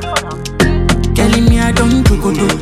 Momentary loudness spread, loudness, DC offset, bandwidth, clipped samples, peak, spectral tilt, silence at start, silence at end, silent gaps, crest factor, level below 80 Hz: 7 LU; -12 LUFS; under 0.1%; 15.5 kHz; under 0.1%; 0 dBFS; -5.5 dB/octave; 0 s; 0 s; none; 12 dB; -18 dBFS